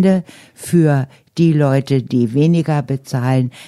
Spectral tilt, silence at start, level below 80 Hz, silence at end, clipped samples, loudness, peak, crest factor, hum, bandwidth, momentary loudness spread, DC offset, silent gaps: -8 dB/octave; 0 s; -54 dBFS; 0 s; under 0.1%; -16 LUFS; -2 dBFS; 12 dB; none; 13.5 kHz; 6 LU; under 0.1%; none